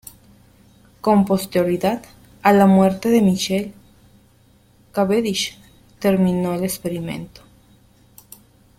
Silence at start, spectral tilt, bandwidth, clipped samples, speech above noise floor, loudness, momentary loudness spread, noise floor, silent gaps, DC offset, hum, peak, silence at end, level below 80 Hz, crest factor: 1.05 s; -6 dB/octave; 16.5 kHz; under 0.1%; 36 dB; -19 LUFS; 14 LU; -54 dBFS; none; under 0.1%; none; -2 dBFS; 1.5 s; -54 dBFS; 18 dB